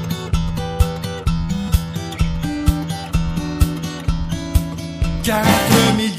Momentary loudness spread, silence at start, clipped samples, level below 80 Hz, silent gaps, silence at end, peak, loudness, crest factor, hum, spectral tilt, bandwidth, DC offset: 10 LU; 0 s; under 0.1%; -24 dBFS; none; 0 s; 0 dBFS; -20 LUFS; 18 dB; none; -5 dB/octave; 15.5 kHz; under 0.1%